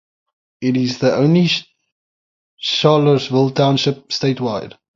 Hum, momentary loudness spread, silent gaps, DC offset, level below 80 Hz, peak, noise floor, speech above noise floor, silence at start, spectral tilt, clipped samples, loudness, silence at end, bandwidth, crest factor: none; 9 LU; 1.92-2.57 s; under 0.1%; -58 dBFS; 0 dBFS; under -90 dBFS; over 74 dB; 0.6 s; -6 dB/octave; under 0.1%; -16 LUFS; 0.25 s; 7.6 kHz; 16 dB